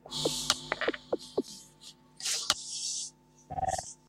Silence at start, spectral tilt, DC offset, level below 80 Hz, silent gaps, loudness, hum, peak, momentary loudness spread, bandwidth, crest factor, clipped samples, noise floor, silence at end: 0.05 s; -1.5 dB/octave; under 0.1%; -60 dBFS; none; -33 LUFS; none; -2 dBFS; 17 LU; 16 kHz; 32 dB; under 0.1%; -55 dBFS; 0.15 s